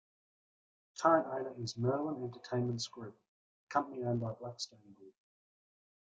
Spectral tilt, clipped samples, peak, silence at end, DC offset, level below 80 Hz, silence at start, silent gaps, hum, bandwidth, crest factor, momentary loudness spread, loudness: -5.5 dB/octave; under 0.1%; -14 dBFS; 1 s; under 0.1%; -76 dBFS; 0.95 s; 3.28-3.67 s; none; 9.2 kHz; 24 dB; 15 LU; -36 LUFS